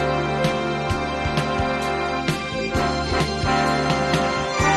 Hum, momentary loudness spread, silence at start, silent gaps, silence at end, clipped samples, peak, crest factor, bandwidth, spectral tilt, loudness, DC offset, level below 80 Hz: none; 4 LU; 0 s; none; 0 s; under 0.1%; -8 dBFS; 14 dB; 13 kHz; -5 dB/octave; -22 LUFS; under 0.1%; -36 dBFS